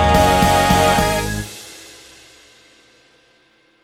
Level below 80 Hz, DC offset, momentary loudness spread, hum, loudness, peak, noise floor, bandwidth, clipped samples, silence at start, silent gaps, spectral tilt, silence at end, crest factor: -30 dBFS; under 0.1%; 22 LU; none; -15 LUFS; 0 dBFS; -56 dBFS; 18.5 kHz; under 0.1%; 0 s; none; -4.5 dB/octave; 2.05 s; 18 dB